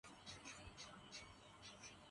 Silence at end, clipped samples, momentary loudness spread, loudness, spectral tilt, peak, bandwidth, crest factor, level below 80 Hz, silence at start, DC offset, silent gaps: 0 s; under 0.1%; 4 LU; -57 LUFS; -2.5 dB/octave; -42 dBFS; 11.5 kHz; 18 dB; -72 dBFS; 0.05 s; under 0.1%; none